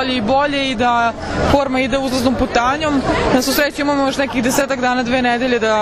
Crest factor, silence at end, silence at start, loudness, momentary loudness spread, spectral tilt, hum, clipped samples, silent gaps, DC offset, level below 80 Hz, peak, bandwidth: 16 dB; 0 s; 0 s; -16 LUFS; 2 LU; -4 dB/octave; none; under 0.1%; none; under 0.1%; -34 dBFS; 0 dBFS; 14 kHz